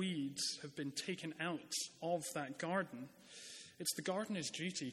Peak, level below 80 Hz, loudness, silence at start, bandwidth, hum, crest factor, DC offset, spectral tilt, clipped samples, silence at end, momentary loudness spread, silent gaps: -24 dBFS; -86 dBFS; -42 LUFS; 0 s; 16 kHz; none; 18 dB; under 0.1%; -3.5 dB/octave; under 0.1%; 0 s; 12 LU; none